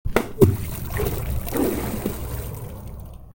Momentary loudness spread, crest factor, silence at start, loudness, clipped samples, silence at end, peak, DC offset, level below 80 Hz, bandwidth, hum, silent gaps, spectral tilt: 17 LU; 22 dB; 0.05 s; -24 LUFS; under 0.1%; 0.05 s; -2 dBFS; under 0.1%; -34 dBFS; 17.5 kHz; none; none; -6.5 dB/octave